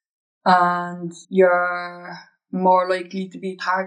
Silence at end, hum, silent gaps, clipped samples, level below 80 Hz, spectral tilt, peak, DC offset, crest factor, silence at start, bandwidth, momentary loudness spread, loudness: 0 s; none; none; under 0.1%; -90 dBFS; -6.5 dB/octave; -4 dBFS; under 0.1%; 18 dB; 0.45 s; 9.8 kHz; 16 LU; -20 LUFS